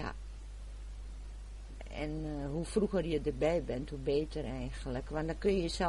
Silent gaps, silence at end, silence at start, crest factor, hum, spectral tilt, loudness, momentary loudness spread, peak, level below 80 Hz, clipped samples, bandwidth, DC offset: none; 0 s; 0 s; 18 dB; none; -6 dB/octave; -36 LUFS; 16 LU; -18 dBFS; -44 dBFS; under 0.1%; 11.5 kHz; under 0.1%